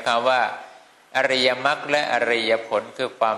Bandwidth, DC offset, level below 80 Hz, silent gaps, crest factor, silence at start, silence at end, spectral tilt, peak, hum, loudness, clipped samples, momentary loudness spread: 12.5 kHz; under 0.1%; -68 dBFS; none; 18 dB; 0 s; 0 s; -3 dB/octave; -4 dBFS; none; -21 LUFS; under 0.1%; 8 LU